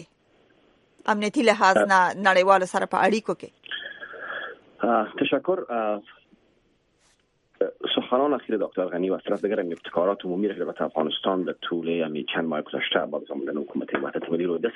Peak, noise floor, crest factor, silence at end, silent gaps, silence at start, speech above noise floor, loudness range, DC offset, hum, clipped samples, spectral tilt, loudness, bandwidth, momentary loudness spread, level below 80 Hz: -4 dBFS; -66 dBFS; 22 dB; 0 s; none; 0 s; 42 dB; 7 LU; under 0.1%; none; under 0.1%; -4.5 dB/octave; -25 LUFS; 11.5 kHz; 14 LU; -72 dBFS